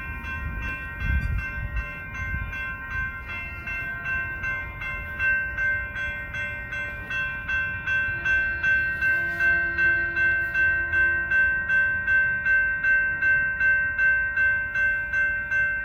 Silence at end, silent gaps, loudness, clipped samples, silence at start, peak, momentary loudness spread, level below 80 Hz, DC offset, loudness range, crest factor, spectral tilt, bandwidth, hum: 0 s; none; -24 LUFS; under 0.1%; 0 s; -12 dBFS; 10 LU; -38 dBFS; under 0.1%; 9 LU; 12 dB; -5 dB/octave; 15.5 kHz; none